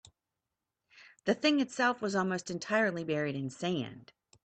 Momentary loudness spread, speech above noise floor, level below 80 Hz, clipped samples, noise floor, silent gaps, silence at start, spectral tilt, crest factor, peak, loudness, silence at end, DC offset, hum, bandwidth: 8 LU; 57 dB; -74 dBFS; under 0.1%; -88 dBFS; none; 0.95 s; -5 dB/octave; 20 dB; -14 dBFS; -32 LUFS; 0.4 s; under 0.1%; none; 9 kHz